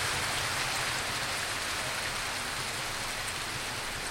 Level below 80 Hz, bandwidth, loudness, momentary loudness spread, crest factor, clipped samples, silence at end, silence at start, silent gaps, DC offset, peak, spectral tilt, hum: -52 dBFS; 16.5 kHz; -31 LUFS; 4 LU; 16 dB; under 0.1%; 0 s; 0 s; none; under 0.1%; -18 dBFS; -1.5 dB/octave; none